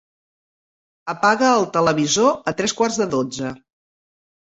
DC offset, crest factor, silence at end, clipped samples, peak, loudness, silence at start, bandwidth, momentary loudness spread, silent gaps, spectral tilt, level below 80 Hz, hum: under 0.1%; 18 dB; 0.95 s; under 0.1%; -2 dBFS; -19 LUFS; 1.05 s; 8.2 kHz; 13 LU; none; -3.5 dB/octave; -60 dBFS; none